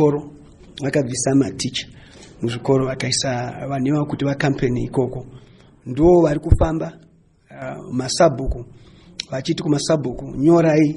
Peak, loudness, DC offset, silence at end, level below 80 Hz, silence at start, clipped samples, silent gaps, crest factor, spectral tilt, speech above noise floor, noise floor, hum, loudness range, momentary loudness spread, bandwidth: 0 dBFS; -20 LUFS; under 0.1%; 0 s; -34 dBFS; 0 s; under 0.1%; none; 18 dB; -5.5 dB/octave; 31 dB; -50 dBFS; none; 3 LU; 17 LU; 11.5 kHz